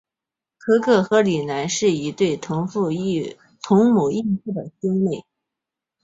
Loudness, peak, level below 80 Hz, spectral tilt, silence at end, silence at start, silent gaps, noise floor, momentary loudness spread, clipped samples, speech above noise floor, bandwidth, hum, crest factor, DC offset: -20 LUFS; -2 dBFS; -60 dBFS; -5.5 dB/octave; 0.8 s; 0.65 s; none; -87 dBFS; 11 LU; under 0.1%; 68 dB; 8 kHz; none; 18 dB; under 0.1%